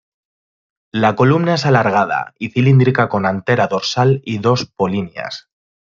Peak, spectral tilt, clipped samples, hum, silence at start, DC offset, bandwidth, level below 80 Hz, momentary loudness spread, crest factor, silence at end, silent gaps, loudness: -2 dBFS; -6.5 dB/octave; under 0.1%; none; 0.95 s; under 0.1%; 7.4 kHz; -56 dBFS; 11 LU; 14 dB; 0.5 s; none; -16 LUFS